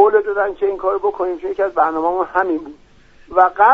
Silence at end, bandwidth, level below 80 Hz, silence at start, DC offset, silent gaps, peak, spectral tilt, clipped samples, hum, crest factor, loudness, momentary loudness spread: 0 s; 5.4 kHz; -50 dBFS; 0 s; under 0.1%; none; 0 dBFS; -6.5 dB/octave; under 0.1%; none; 16 dB; -18 LUFS; 7 LU